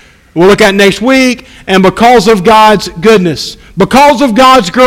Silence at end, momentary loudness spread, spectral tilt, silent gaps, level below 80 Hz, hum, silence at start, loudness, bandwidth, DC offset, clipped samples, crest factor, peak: 0 s; 9 LU; -4.5 dB/octave; none; -34 dBFS; none; 0.35 s; -6 LUFS; 17 kHz; under 0.1%; 6%; 6 dB; 0 dBFS